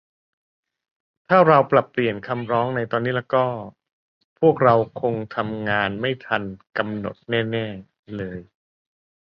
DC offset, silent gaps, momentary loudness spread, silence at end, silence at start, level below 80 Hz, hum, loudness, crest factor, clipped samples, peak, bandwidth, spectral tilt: under 0.1%; 3.92-4.36 s, 7.99-8.03 s; 16 LU; 0.95 s; 1.3 s; -58 dBFS; none; -21 LUFS; 22 dB; under 0.1%; -2 dBFS; 5.8 kHz; -9 dB/octave